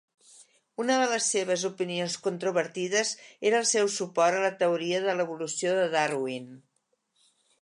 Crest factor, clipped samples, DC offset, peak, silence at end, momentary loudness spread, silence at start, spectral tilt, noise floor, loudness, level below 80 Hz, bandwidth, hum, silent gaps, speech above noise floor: 18 dB; under 0.1%; under 0.1%; -12 dBFS; 1.05 s; 7 LU; 0.4 s; -2.5 dB/octave; -76 dBFS; -27 LUFS; -84 dBFS; 11.5 kHz; none; none; 48 dB